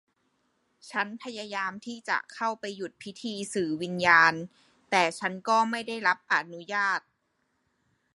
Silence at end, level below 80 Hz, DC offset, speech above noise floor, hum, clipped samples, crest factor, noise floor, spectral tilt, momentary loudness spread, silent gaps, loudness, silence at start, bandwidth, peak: 1.15 s; -74 dBFS; under 0.1%; 47 dB; none; under 0.1%; 24 dB; -75 dBFS; -3.5 dB/octave; 17 LU; none; -27 LUFS; 0.85 s; 11.5 kHz; -6 dBFS